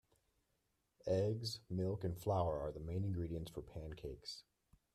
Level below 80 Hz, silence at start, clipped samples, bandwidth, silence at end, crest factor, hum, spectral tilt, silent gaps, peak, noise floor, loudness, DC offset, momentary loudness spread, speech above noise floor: -60 dBFS; 1.05 s; under 0.1%; 14 kHz; 0.55 s; 18 dB; none; -7 dB/octave; none; -26 dBFS; -83 dBFS; -42 LUFS; under 0.1%; 12 LU; 42 dB